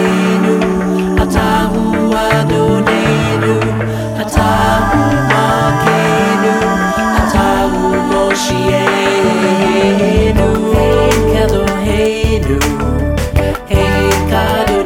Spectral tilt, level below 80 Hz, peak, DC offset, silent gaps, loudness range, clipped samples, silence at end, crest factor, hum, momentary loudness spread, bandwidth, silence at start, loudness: -5.5 dB/octave; -22 dBFS; 0 dBFS; under 0.1%; none; 1 LU; under 0.1%; 0 s; 12 dB; none; 3 LU; 17.5 kHz; 0 s; -12 LUFS